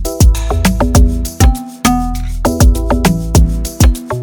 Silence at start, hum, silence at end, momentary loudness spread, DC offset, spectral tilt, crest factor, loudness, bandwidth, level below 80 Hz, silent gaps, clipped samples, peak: 0 s; none; 0 s; 5 LU; under 0.1%; -5.5 dB/octave; 10 dB; -13 LUFS; 19 kHz; -14 dBFS; none; under 0.1%; 0 dBFS